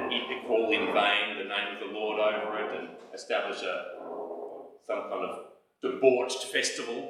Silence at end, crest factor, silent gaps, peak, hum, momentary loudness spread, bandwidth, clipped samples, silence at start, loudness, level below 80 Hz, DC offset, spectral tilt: 0 s; 22 dB; none; -8 dBFS; none; 15 LU; 14 kHz; under 0.1%; 0 s; -30 LUFS; -82 dBFS; under 0.1%; -2 dB/octave